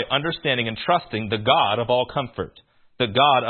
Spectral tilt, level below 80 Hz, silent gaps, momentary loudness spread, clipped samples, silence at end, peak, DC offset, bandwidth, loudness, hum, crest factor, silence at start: -10 dB/octave; -54 dBFS; none; 10 LU; under 0.1%; 0 s; -2 dBFS; under 0.1%; 4.4 kHz; -21 LUFS; none; 20 dB; 0 s